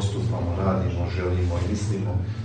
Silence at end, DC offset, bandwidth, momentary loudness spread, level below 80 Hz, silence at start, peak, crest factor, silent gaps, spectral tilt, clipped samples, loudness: 0 s; under 0.1%; 9.2 kHz; 2 LU; -38 dBFS; 0 s; -10 dBFS; 14 dB; none; -7 dB/octave; under 0.1%; -26 LUFS